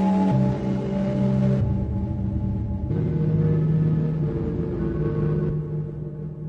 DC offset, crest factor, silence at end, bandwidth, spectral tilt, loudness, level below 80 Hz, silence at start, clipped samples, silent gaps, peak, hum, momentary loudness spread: under 0.1%; 12 dB; 0 s; 5.8 kHz; -10.5 dB/octave; -24 LUFS; -36 dBFS; 0 s; under 0.1%; none; -10 dBFS; none; 7 LU